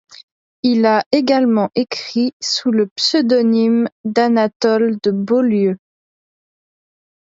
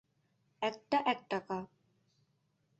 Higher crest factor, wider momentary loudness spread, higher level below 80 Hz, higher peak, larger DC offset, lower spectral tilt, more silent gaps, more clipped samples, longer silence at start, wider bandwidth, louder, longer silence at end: second, 16 dB vs 22 dB; second, 6 LU vs 10 LU; first, -66 dBFS vs -78 dBFS; first, -2 dBFS vs -18 dBFS; neither; first, -5 dB/octave vs -2.5 dB/octave; first, 1.06-1.11 s, 2.33-2.40 s, 2.91-2.96 s, 3.92-4.04 s, 4.56-4.60 s vs none; neither; about the same, 0.65 s vs 0.6 s; about the same, 7.8 kHz vs 8 kHz; first, -16 LUFS vs -36 LUFS; first, 1.6 s vs 1.15 s